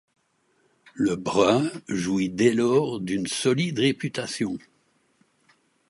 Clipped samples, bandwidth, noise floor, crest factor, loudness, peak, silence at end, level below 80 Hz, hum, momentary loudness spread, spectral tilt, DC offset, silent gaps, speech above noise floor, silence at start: under 0.1%; 11.5 kHz; -68 dBFS; 20 dB; -24 LUFS; -6 dBFS; 1.3 s; -60 dBFS; none; 9 LU; -5 dB/octave; under 0.1%; none; 44 dB; 0.95 s